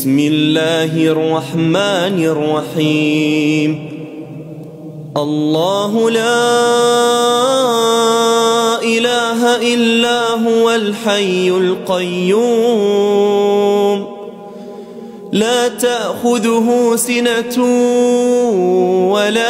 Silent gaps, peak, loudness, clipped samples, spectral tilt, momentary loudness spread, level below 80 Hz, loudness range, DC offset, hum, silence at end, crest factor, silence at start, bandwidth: none; -2 dBFS; -13 LUFS; under 0.1%; -4.5 dB/octave; 16 LU; -60 dBFS; 4 LU; under 0.1%; none; 0 s; 12 dB; 0 s; 16 kHz